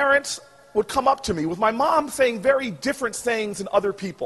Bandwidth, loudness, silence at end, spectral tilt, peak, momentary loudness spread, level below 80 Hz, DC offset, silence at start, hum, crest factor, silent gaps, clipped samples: 12 kHz; -23 LUFS; 0 s; -3.5 dB/octave; -6 dBFS; 7 LU; -52 dBFS; under 0.1%; 0 s; none; 18 dB; none; under 0.1%